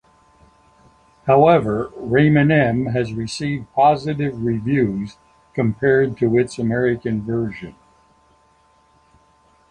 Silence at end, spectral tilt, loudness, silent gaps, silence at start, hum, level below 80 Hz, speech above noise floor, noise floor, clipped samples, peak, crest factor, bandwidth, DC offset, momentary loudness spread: 2 s; -7.5 dB/octave; -18 LUFS; none; 1.25 s; none; -48 dBFS; 39 dB; -57 dBFS; under 0.1%; -2 dBFS; 18 dB; 10.5 kHz; under 0.1%; 12 LU